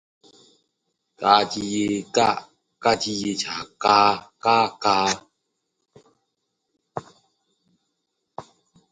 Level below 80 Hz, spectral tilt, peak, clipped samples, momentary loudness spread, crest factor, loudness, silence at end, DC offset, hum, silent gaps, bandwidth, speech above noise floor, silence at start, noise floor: -62 dBFS; -3 dB/octave; 0 dBFS; under 0.1%; 20 LU; 24 dB; -21 LUFS; 0.5 s; under 0.1%; none; none; 9.6 kHz; 56 dB; 1.2 s; -77 dBFS